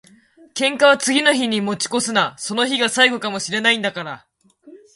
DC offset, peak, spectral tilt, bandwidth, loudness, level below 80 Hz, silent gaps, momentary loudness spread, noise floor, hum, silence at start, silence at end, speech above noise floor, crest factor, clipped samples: under 0.1%; 0 dBFS; -2.5 dB/octave; 11.5 kHz; -17 LUFS; -66 dBFS; none; 11 LU; -46 dBFS; none; 0.55 s; 0.2 s; 28 dB; 20 dB; under 0.1%